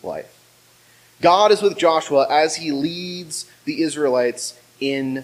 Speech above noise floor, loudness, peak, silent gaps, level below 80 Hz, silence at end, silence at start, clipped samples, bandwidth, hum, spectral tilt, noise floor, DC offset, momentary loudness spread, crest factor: 34 dB; -19 LUFS; -2 dBFS; none; -64 dBFS; 0 s; 0.05 s; under 0.1%; 15.5 kHz; none; -3.5 dB/octave; -53 dBFS; under 0.1%; 14 LU; 18 dB